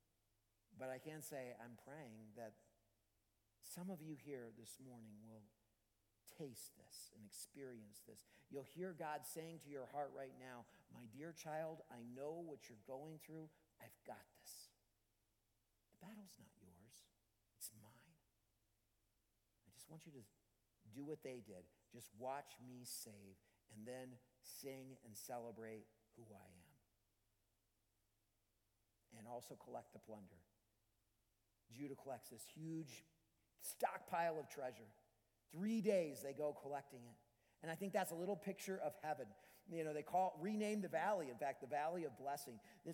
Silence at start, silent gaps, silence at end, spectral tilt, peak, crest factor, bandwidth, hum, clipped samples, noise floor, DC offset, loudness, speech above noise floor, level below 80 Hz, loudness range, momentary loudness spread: 0.7 s; none; 0 s; -5 dB/octave; -28 dBFS; 24 dB; 19 kHz; none; under 0.1%; -85 dBFS; under 0.1%; -50 LUFS; 36 dB; -88 dBFS; 18 LU; 21 LU